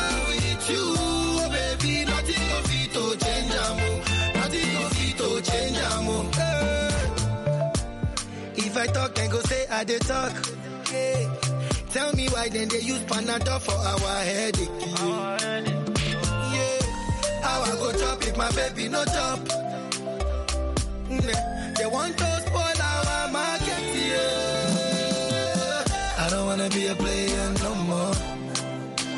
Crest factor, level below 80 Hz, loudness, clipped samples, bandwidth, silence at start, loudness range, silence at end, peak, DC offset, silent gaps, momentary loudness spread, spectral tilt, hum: 18 dB; -36 dBFS; -26 LUFS; under 0.1%; 11.5 kHz; 0 s; 2 LU; 0 s; -8 dBFS; under 0.1%; none; 5 LU; -4 dB/octave; none